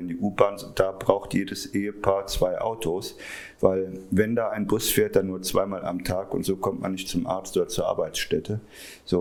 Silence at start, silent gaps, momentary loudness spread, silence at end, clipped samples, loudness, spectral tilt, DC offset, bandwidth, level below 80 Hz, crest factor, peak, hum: 0 s; none; 7 LU; 0 s; under 0.1%; -26 LUFS; -5 dB/octave; under 0.1%; over 20 kHz; -46 dBFS; 24 dB; 0 dBFS; none